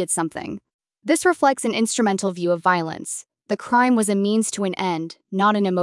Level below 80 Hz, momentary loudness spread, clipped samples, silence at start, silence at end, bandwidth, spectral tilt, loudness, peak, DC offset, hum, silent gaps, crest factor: -68 dBFS; 12 LU; under 0.1%; 0 s; 0 s; 12 kHz; -4 dB/octave; -21 LUFS; -6 dBFS; under 0.1%; none; 0.74-0.79 s; 16 dB